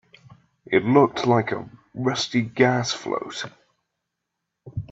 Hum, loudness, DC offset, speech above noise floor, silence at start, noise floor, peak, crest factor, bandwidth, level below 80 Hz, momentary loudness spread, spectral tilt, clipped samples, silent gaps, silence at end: none; -22 LUFS; under 0.1%; 59 dB; 0.7 s; -81 dBFS; -2 dBFS; 22 dB; 8 kHz; -58 dBFS; 17 LU; -5.5 dB/octave; under 0.1%; none; 0.05 s